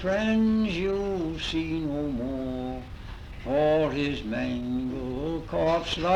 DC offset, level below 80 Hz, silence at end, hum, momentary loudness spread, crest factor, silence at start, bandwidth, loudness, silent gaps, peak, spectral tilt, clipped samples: under 0.1%; -42 dBFS; 0 s; none; 11 LU; 14 dB; 0 s; 10 kHz; -28 LUFS; none; -14 dBFS; -6.5 dB/octave; under 0.1%